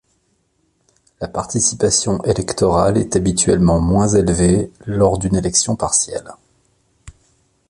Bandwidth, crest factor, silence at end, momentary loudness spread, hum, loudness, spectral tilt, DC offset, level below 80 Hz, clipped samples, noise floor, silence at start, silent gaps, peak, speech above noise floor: 11.5 kHz; 16 dB; 0.6 s; 9 LU; none; -16 LUFS; -5 dB/octave; under 0.1%; -34 dBFS; under 0.1%; -64 dBFS; 1.2 s; none; 0 dBFS; 48 dB